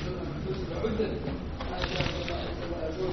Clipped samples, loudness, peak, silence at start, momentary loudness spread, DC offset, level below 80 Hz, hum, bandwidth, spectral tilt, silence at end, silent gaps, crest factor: under 0.1%; -33 LUFS; -14 dBFS; 0 s; 5 LU; under 0.1%; -40 dBFS; none; 6.4 kHz; -5 dB/octave; 0 s; none; 18 dB